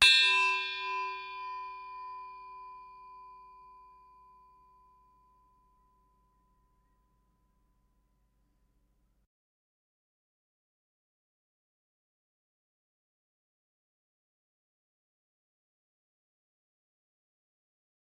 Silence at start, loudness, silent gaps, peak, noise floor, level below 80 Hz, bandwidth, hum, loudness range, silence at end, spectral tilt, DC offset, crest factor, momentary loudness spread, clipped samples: 0 s; -28 LUFS; none; -8 dBFS; -73 dBFS; -72 dBFS; 10 kHz; none; 26 LU; 14.65 s; 1.5 dB/octave; under 0.1%; 30 dB; 28 LU; under 0.1%